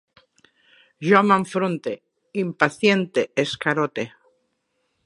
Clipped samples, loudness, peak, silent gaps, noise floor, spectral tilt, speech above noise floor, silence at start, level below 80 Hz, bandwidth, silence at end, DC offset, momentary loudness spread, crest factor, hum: under 0.1%; -21 LUFS; 0 dBFS; none; -72 dBFS; -5.5 dB/octave; 52 dB; 1 s; -68 dBFS; 11.5 kHz; 1 s; under 0.1%; 15 LU; 22 dB; none